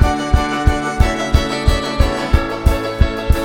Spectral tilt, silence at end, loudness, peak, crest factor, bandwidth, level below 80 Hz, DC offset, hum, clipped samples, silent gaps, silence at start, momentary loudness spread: -6 dB/octave; 0 s; -17 LUFS; 0 dBFS; 14 dB; 16.5 kHz; -18 dBFS; under 0.1%; none; under 0.1%; none; 0 s; 2 LU